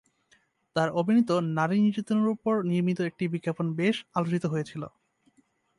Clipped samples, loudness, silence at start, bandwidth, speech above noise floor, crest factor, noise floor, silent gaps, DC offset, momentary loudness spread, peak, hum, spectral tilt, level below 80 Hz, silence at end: under 0.1%; -27 LUFS; 0.75 s; 11.5 kHz; 41 dB; 16 dB; -67 dBFS; none; under 0.1%; 8 LU; -10 dBFS; none; -7.5 dB/octave; -70 dBFS; 0.9 s